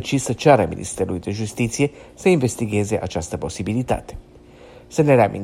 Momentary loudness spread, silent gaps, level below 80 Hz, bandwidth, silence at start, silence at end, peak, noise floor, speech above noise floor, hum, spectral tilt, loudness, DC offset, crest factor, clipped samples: 11 LU; none; -44 dBFS; 16 kHz; 0 s; 0 s; 0 dBFS; -44 dBFS; 24 dB; none; -6 dB/octave; -21 LUFS; under 0.1%; 20 dB; under 0.1%